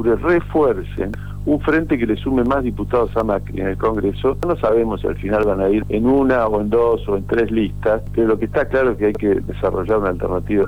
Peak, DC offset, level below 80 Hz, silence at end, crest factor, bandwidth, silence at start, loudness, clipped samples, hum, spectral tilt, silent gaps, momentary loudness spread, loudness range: -8 dBFS; 2%; -32 dBFS; 0 s; 10 dB; 19.5 kHz; 0 s; -18 LUFS; under 0.1%; 50 Hz at -30 dBFS; -8.5 dB/octave; none; 5 LU; 2 LU